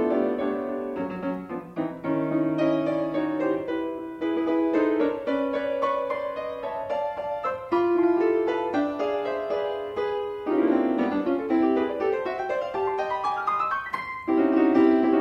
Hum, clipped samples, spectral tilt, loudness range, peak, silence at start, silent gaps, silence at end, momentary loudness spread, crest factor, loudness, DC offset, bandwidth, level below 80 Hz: none; under 0.1%; -7.5 dB/octave; 2 LU; -10 dBFS; 0 s; none; 0 s; 9 LU; 16 dB; -26 LUFS; under 0.1%; 6.6 kHz; -62 dBFS